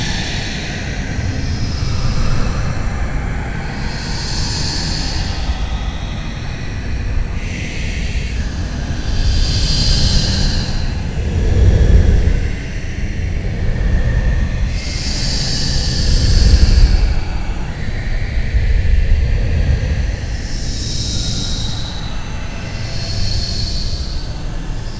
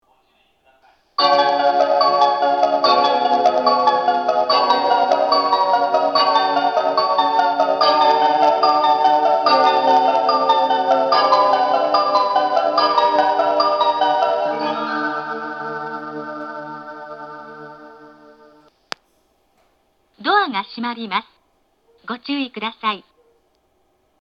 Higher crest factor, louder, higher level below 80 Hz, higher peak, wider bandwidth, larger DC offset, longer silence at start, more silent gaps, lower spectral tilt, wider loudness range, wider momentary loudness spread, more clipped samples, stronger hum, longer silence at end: about the same, 16 dB vs 18 dB; second, -19 LUFS vs -16 LUFS; first, -18 dBFS vs -72 dBFS; about the same, 0 dBFS vs 0 dBFS; first, 8 kHz vs 7 kHz; first, 0.5% vs under 0.1%; second, 0 s vs 1.2 s; neither; about the same, -4.5 dB/octave vs -3.5 dB/octave; second, 6 LU vs 13 LU; second, 10 LU vs 15 LU; neither; neither; second, 0 s vs 1.2 s